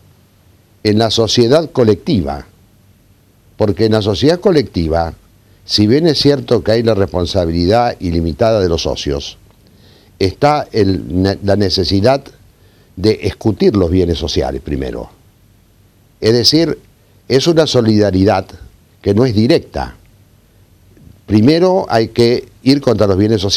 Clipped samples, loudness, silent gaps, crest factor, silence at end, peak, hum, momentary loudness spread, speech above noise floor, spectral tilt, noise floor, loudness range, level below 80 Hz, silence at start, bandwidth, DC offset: under 0.1%; -13 LUFS; none; 14 dB; 0 s; 0 dBFS; none; 9 LU; 37 dB; -6 dB/octave; -49 dBFS; 3 LU; -34 dBFS; 0.85 s; 16.5 kHz; under 0.1%